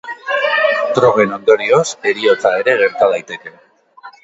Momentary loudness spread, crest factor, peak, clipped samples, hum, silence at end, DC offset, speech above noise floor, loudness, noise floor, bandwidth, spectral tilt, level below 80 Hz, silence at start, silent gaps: 7 LU; 14 dB; 0 dBFS; under 0.1%; none; 0.15 s; under 0.1%; 27 dB; -14 LUFS; -40 dBFS; 8 kHz; -4 dB/octave; -60 dBFS; 0.05 s; none